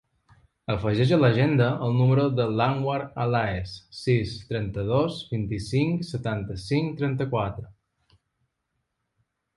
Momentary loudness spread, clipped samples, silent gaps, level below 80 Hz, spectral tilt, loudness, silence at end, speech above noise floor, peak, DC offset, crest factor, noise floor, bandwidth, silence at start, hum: 10 LU; under 0.1%; none; -50 dBFS; -7.5 dB/octave; -25 LUFS; 1.85 s; 54 dB; -6 dBFS; under 0.1%; 20 dB; -79 dBFS; 11.5 kHz; 0.7 s; none